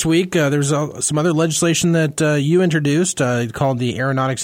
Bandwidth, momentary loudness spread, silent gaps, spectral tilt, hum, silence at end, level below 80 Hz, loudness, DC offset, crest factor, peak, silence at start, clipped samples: 16 kHz; 4 LU; none; -5 dB/octave; none; 0 s; -50 dBFS; -17 LUFS; under 0.1%; 12 dB; -4 dBFS; 0 s; under 0.1%